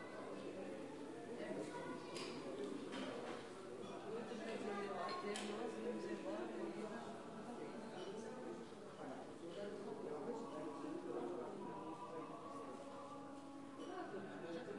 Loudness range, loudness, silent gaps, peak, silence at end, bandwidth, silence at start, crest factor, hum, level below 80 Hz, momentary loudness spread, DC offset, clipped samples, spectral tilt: 4 LU; -49 LUFS; none; -32 dBFS; 0 s; 11.5 kHz; 0 s; 16 dB; none; -86 dBFS; 7 LU; under 0.1%; under 0.1%; -5 dB/octave